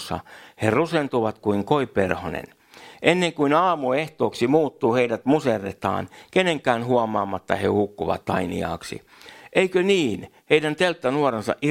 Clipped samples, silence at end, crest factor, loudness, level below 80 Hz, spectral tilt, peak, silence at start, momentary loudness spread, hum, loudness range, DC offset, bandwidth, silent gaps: under 0.1%; 0 s; 22 dB; -22 LUFS; -56 dBFS; -5.5 dB/octave; 0 dBFS; 0 s; 8 LU; none; 3 LU; under 0.1%; 16 kHz; none